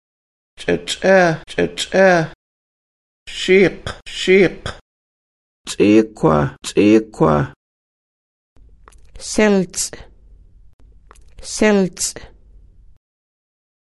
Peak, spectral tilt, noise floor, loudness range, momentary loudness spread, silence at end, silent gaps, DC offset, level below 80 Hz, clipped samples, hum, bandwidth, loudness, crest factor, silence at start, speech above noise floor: 0 dBFS; -5 dB/octave; -45 dBFS; 6 LU; 17 LU; 1.55 s; 2.35-3.26 s, 4.81-5.64 s, 7.56-8.56 s, 10.73-10.79 s; under 0.1%; -44 dBFS; under 0.1%; none; 12.5 kHz; -16 LUFS; 18 dB; 0.6 s; 30 dB